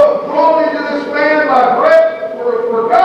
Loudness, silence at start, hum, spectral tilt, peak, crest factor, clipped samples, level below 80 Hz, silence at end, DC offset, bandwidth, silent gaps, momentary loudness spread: -12 LUFS; 0 s; none; -5.5 dB/octave; 0 dBFS; 12 dB; under 0.1%; -58 dBFS; 0 s; under 0.1%; 8 kHz; none; 8 LU